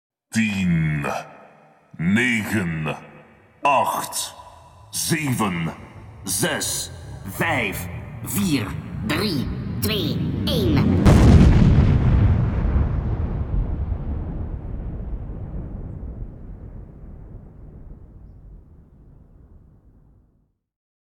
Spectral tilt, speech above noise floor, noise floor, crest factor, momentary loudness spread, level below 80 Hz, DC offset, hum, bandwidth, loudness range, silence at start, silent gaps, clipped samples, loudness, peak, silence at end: -5.5 dB/octave; 42 dB; -64 dBFS; 20 dB; 20 LU; -28 dBFS; under 0.1%; none; 19 kHz; 18 LU; 0.35 s; none; under 0.1%; -21 LUFS; -2 dBFS; 2.5 s